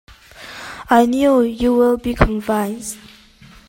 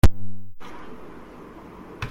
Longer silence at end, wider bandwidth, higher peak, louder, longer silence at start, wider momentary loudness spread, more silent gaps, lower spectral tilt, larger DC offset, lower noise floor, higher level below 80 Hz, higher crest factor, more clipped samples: first, 0.7 s vs 0 s; about the same, 16.5 kHz vs 16.5 kHz; about the same, 0 dBFS vs -2 dBFS; first, -16 LUFS vs -35 LUFS; first, 0.4 s vs 0.05 s; first, 19 LU vs 9 LU; neither; about the same, -6 dB/octave vs -6.5 dB/octave; neither; about the same, -45 dBFS vs -42 dBFS; about the same, -32 dBFS vs -30 dBFS; about the same, 18 dB vs 18 dB; neither